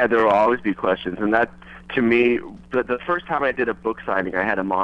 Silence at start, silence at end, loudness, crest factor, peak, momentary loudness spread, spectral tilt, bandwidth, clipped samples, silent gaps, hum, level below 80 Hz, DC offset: 0 s; 0 s; -21 LUFS; 18 dB; -2 dBFS; 9 LU; -7 dB/octave; 6.8 kHz; under 0.1%; none; none; -50 dBFS; under 0.1%